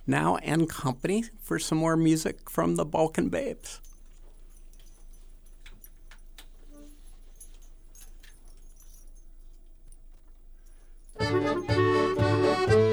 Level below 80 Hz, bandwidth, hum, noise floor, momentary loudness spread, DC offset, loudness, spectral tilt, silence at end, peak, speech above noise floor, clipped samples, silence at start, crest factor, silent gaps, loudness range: -48 dBFS; over 20 kHz; none; -49 dBFS; 9 LU; under 0.1%; -27 LUFS; -6 dB/octave; 0 s; -8 dBFS; 22 dB; under 0.1%; 0 s; 20 dB; none; 25 LU